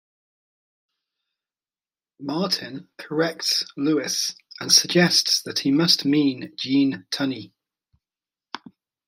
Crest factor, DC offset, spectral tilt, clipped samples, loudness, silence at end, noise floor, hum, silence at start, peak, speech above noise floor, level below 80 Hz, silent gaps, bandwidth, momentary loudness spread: 22 dB; under 0.1%; -3 dB/octave; under 0.1%; -21 LUFS; 0.5 s; under -90 dBFS; none; 2.2 s; -2 dBFS; over 68 dB; -72 dBFS; none; 16 kHz; 20 LU